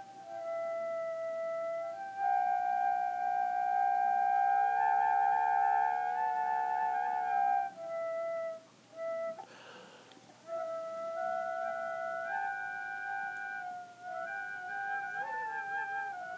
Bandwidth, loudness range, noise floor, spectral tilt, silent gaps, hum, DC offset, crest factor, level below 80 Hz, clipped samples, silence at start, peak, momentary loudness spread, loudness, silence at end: 8 kHz; 10 LU; -57 dBFS; -3.5 dB/octave; none; none; under 0.1%; 14 dB; under -90 dBFS; under 0.1%; 0 s; -20 dBFS; 13 LU; -34 LUFS; 0 s